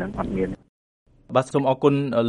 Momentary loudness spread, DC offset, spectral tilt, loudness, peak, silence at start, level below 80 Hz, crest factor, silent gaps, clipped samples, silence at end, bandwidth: 9 LU; under 0.1%; -7.5 dB/octave; -23 LUFS; -4 dBFS; 0 s; -46 dBFS; 18 dB; 0.69-1.06 s; under 0.1%; 0 s; 11 kHz